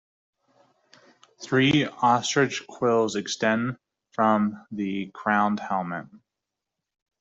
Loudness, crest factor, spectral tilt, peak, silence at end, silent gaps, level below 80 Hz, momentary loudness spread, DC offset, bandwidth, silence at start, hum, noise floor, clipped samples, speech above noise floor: -24 LUFS; 20 dB; -4.5 dB/octave; -6 dBFS; 1.05 s; none; -66 dBFS; 11 LU; under 0.1%; 8 kHz; 1.4 s; none; -86 dBFS; under 0.1%; 61 dB